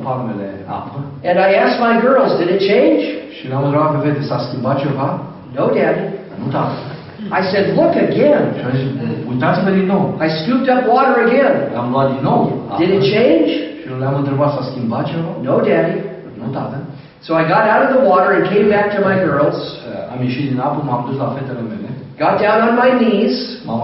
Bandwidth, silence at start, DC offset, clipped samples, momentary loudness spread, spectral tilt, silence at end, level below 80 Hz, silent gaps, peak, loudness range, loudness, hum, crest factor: 6 kHz; 0 s; under 0.1%; under 0.1%; 13 LU; -5.5 dB/octave; 0 s; -54 dBFS; none; 0 dBFS; 4 LU; -15 LUFS; none; 14 dB